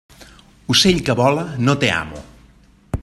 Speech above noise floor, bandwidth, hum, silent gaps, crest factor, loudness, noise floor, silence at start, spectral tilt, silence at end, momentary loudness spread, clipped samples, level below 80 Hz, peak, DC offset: 33 dB; 13 kHz; none; none; 18 dB; -16 LUFS; -50 dBFS; 0.2 s; -4.5 dB/octave; 0 s; 19 LU; under 0.1%; -40 dBFS; 0 dBFS; under 0.1%